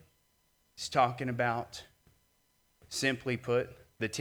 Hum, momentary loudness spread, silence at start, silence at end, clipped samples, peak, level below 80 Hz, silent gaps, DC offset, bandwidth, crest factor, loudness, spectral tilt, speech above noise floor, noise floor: none; 14 LU; 0.75 s; 0 s; under 0.1%; -12 dBFS; -68 dBFS; none; under 0.1%; over 20 kHz; 24 dB; -33 LUFS; -4.5 dB/octave; 40 dB; -72 dBFS